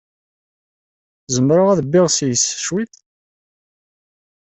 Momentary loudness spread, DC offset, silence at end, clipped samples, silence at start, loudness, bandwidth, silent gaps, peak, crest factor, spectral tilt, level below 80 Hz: 9 LU; under 0.1%; 1.55 s; under 0.1%; 1.3 s; -16 LUFS; 8.4 kHz; none; -2 dBFS; 16 dB; -4.5 dB/octave; -58 dBFS